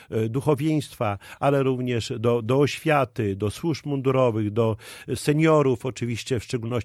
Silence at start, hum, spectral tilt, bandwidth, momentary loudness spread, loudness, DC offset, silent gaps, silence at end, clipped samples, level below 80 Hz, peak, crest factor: 0 s; none; -6.5 dB/octave; 15 kHz; 8 LU; -24 LUFS; under 0.1%; none; 0 s; under 0.1%; -56 dBFS; -6 dBFS; 16 dB